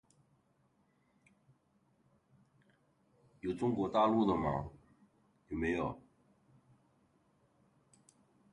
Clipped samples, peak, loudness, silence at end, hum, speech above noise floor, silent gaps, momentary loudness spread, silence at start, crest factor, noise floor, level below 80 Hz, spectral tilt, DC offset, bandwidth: under 0.1%; -18 dBFS; -35 LUFS; 2.55 s; none; 41 dB; none; 15 LU; 3.45 s; 22 dB; -74 dBFS; -62 dBFS; -7.5 dB/octave; under 0.1%; 11 kHz